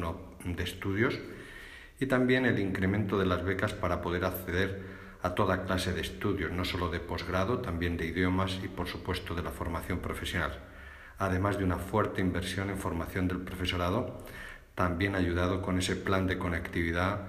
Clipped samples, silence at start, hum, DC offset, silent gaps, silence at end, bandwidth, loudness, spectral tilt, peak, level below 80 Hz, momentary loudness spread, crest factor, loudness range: under 0.1%; 0 s; none; under 0.1%; none; 0 s; 15.5 kHz; -32 LUFS; -6 dB/octave; -14 dBFS; -50 dBFS; 10 LU; 18 dB; 3 LU